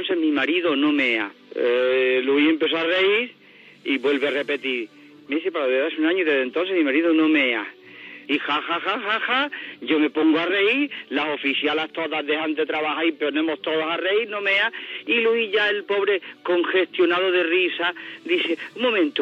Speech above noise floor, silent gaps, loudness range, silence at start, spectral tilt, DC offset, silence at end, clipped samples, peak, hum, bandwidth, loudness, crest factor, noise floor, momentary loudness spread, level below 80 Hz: 20 dB; none; 2 LU; 0 s; -5 dB/octave; under 0.1%; 0 s; under 0.1%; -6 dBFS; none; 7.2 kHz; -21 LUFS; 16 dB; -42 dBFS; 7 LU; -80 dBFS